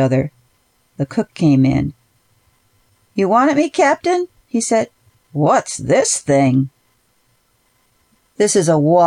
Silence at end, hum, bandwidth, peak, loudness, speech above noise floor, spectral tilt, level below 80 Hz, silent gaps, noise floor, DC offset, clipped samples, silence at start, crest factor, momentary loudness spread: 0 s; none; 13 kHz; -2 dBFS; -16 LUFS; 46 dB; -5.5 dB/octave; -48 dBFS; none; -61 dBFS; under 0.1%; under 0.1%; 0 s; 14 dB; 13 LU